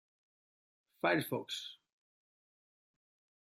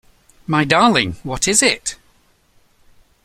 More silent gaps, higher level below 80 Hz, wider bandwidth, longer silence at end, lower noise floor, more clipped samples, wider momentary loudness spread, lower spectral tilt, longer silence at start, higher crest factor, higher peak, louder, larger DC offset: neither; second, -88 dBFS vs -44 dBFS; about the same, 15.5 kHz vs 15.5 kHz; first, 1.75 s vs 1.3 s; first, under -90 dBFS vs -56 dBFS; neither; about the same, 10 LU vs 12 LU; first, -4.5 dB/octave vs -3 dB/octave; first, 1.05 s vs 0.5 s; first, 26 dB vs 20 dB; second, -18 dBFS vs 0 dBFS; second, -36 LUFS vs -16 LUFS; neither